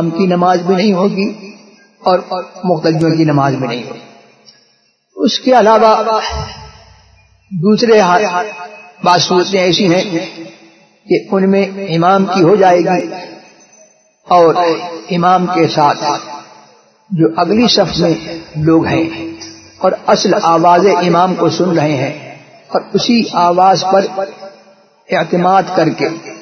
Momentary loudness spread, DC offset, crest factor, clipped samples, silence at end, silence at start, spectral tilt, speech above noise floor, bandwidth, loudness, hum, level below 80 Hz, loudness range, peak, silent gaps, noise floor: 15 LU; under 0.1%; 12 dB; under 0.1%; 0 s; 0 s; -5.5 dB/octave; 44 dB; 6.6 kHz; -12 LUFS; none; -44 dBFS; 2 LU; 0 dBFS; none; -56 dBFS